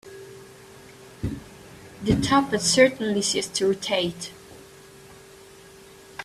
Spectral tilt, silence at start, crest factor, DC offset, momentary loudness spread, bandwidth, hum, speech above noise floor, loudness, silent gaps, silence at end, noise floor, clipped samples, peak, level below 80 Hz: -3.5 dB/octave; 0.05 s; 22 dB; under 0.1%; 26 LU; 14.5 kHz; none; 26 dB; -23 LUFS; none; 0 s; -48 dBFS; under 0.1%; -4 dBFS; -48 dBFS